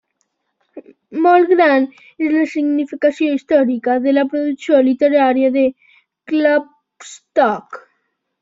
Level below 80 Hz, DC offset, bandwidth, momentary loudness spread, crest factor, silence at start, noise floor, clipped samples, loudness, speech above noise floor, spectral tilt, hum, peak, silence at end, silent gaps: -64 dBFS; under 0.1%; 7.8 kHz; 11 LU; 14 dB; 0.75 s; -69 dBFS; under 0.1%; -15 LUFS; 54 dB; -5 dB/octave; none; -2 dBFS; 0.6 s; none